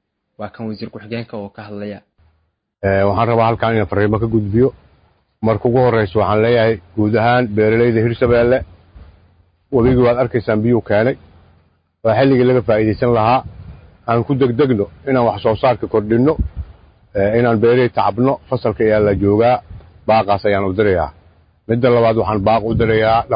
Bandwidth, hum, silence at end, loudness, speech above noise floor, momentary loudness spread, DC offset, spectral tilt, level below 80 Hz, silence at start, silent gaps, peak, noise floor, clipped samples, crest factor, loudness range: 5.2 kHz; none; 0 s; -15 LUFS; 50 dB; 14 LU; under 0.1%; -12.5 dB/octave; -36 dBFS; 0.4 s; none; -2 dBFS; -64 dBFS; under 0.1%; 14 dB; 3 LU